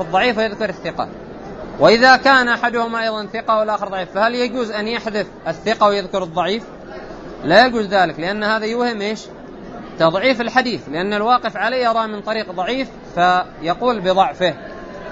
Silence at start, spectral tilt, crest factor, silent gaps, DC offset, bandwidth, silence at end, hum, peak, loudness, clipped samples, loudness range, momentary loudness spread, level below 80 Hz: 0 s; -4.5 dB/octave; 18 dB; none; under 0.1%; 8 kHz; 0 s; none; 0 dBFS; -17 LUFS; under 0.1%; 4 LU; 19 LU; -46 dBFS